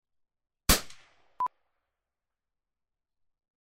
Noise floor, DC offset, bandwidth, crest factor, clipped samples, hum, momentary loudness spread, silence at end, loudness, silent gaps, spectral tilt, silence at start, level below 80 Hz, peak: -90 dBFS; under 0.1%; 16 kHz; 30 dB; under 0.1%; none; 11 LU; 2.15 s; -29 LUFS; none; -2 dB/octave; 0.7 s; -44 dBFS; -6 dBFS